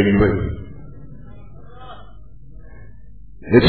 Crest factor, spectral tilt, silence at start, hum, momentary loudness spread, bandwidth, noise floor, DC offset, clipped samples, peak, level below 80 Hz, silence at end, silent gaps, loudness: 22 dB; -10.5 dB/octave; 0 s; none; 28 LU; 4.6 kHz; -43 dBFS; 1%; under 0.1%; 0 dBFS; -36 dBFS; 0 s; none; -19 LUFS